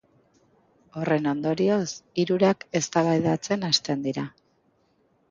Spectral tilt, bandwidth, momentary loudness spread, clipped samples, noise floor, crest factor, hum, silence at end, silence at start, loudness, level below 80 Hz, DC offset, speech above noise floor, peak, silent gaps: -5 dB/octave; 9.2 kHz; 9 LU; under 0.1%; -66 dBFS; 20 dB; none; 1 s; 0.95 s; -25 LUFS; -66 dBFS; under 0.1%; 42 dB; -6 dBFS; none